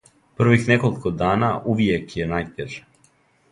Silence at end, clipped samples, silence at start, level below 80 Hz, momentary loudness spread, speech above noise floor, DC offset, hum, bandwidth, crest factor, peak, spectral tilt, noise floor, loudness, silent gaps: 0.75 s; under 0.1%; 0.4 s; -46 dBFS; 15 LU; 39 dB; under 0.1%; none; 11 kHz; 20 dB; -2 dBFS; -7 dB/octave; -60 dBFS; -21 LUFS; none